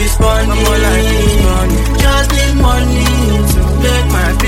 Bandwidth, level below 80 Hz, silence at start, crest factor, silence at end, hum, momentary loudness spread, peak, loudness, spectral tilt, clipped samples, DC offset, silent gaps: 16.5 kHz; -12 dBFS; 0 s; 10 dB; 0 s; none; 1 LU; 0 dBFS; -12 LUFS; -5 dB/octave; under 0.1%; under 0.1%; none